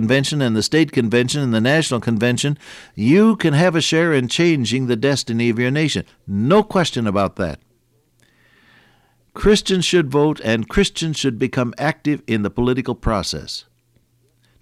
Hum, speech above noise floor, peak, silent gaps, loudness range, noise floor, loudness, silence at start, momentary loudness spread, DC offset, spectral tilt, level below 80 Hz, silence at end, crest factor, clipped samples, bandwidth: none; 43 dB; -2 dBFS; none; 5 LU; -61 dBFS; -18 LUFS; 0 s; 7 LU; under 0.1%; -5 dB/octave; -40 dBFS; 1 s; 16 dB; under 0.1%; 14.5 kHz